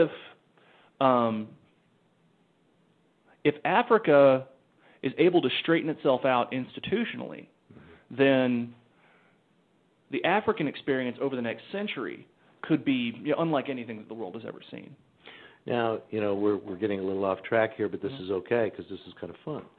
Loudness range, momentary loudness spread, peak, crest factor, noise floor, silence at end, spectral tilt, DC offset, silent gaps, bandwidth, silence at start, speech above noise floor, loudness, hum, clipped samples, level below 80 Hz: 7 LU; 18 LU; -8 dBFS; 22 dB; -66 dBFS; 0.15 s; -9 dB/octave; under 0.1%; none; 4.5 kHz; 0 s; 39 dB; -27 LUFS; none; under 0.1%; -72 dBFS